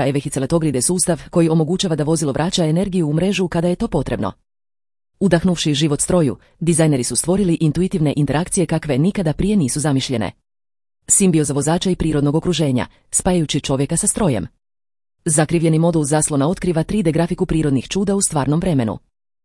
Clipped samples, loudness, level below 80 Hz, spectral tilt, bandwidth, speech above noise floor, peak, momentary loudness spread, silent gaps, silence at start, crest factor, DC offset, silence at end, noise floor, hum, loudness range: under 0.1%; -18 LUFS; -38 dBFS; -5 dB/octave; 12 kHz; over 73 dB; 0 dBFS; 5 LU; none; 0 s; 18 dB; under 0.1%; 0.45 s; under -90 dBFS; none; 2 LU